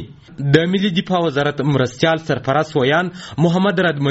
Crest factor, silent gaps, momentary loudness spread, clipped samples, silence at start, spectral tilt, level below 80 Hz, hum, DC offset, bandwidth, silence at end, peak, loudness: 18 dB; none; 4 LU; under 0.1%; 0 s; -5 dB/octave; -50 dBFS; none; under 0.1%; 8 kHz; 0 s; 0 dBFS; -17 LUFS